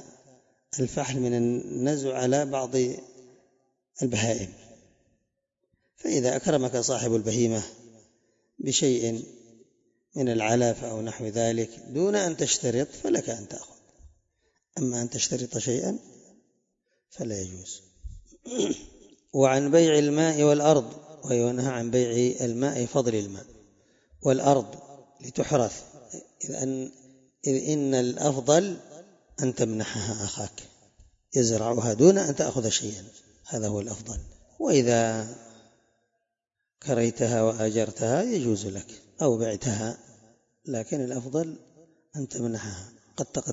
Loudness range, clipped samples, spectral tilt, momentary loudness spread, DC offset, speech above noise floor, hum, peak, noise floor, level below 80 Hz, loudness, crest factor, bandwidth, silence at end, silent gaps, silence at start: 8 LU; under 0.1%; -5 dB/octave; 18 LU; under 0.1%; 59 dB; none; -6 dBFS; -85 dBFS; -58 dBFS; -26 LUFS; 22 dB; 8 kHz; 0 s; none; 0 s